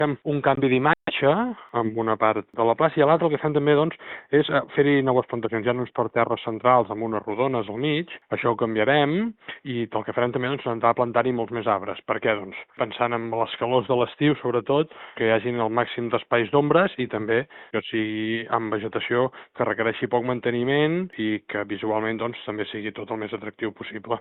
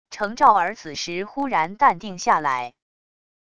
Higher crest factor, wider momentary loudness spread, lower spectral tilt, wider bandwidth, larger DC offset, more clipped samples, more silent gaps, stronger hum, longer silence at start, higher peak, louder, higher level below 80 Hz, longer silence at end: about the same, 18 dB vs 20 dB; about the same, 10 LU vs 12 LU; about the same, -4.5 dB/octave vs -3.5 dB/octave; second, 4.2 kHz vs 10.5 kHz; second, under 0.1% vs 0.5%; neither; neither; neither; about the same, 0 s vs 0.1 s; about the same, -4 dBFS vs -2 dBFS; second, -24 LUFS vs -21 LUFS; about the same, -62 dBFS vs -60 dBFS; second, 0 s vs 0.75 s